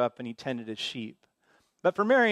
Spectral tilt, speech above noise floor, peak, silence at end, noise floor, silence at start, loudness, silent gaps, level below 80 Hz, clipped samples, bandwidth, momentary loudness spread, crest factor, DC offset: -5 dB/octave; 41 dB; -12 dBFS; 0 s; -68 dBFS; 0 s; -30 LUFS; none; -78 dBFS; under 0.1%; 11 kHz; 15 LU; 18 dB; under 0.1%